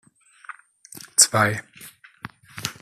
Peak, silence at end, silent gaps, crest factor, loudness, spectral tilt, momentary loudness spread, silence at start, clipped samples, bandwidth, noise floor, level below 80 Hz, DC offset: 0 dBFS; 0.1 s; none; 26 dB; -19 LUFS; -1.5 dB/octave; 26 LU; 0.95 s; under 0.1%; 15 kHz; -46 dBFS; -66 dBFS; under 0.1%